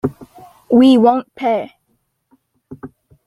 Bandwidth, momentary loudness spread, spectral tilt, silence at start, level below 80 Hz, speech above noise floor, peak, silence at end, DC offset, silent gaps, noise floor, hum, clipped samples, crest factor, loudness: 11 kHz; 26 LU; -7 dB/octave; 0.05 s; -56 dBFS; 54 dB; -2 dBFS; 0.4 s; under 0.1%; none; -66 dBFS; none; under 0.1%; 16 dB; -14 LUFS